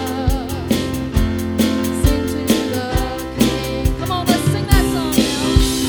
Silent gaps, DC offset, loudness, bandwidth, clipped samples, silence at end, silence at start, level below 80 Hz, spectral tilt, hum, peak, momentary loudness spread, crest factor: none; under 0.1%; -18 LUFS; over 20 kHz; under 0.1%; 0 s; 0 s; -24 dBFS; -5 dB/octave; none; 0 dBFS; 5 LU; 16 dB